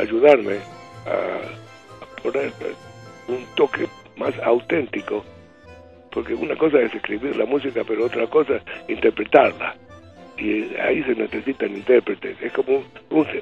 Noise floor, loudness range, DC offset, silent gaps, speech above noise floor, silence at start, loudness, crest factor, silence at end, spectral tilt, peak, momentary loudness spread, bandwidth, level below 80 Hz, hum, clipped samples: -45 dBFS; 6 LU; under 0.1%; none; 24 dB; 0 s; -22 LUFS; 22 dB; 0 s; -6.5 dB/octave; 0 dBFS; 16 LU; 7.8 kHz; -56 dBFS; none; under 0.1%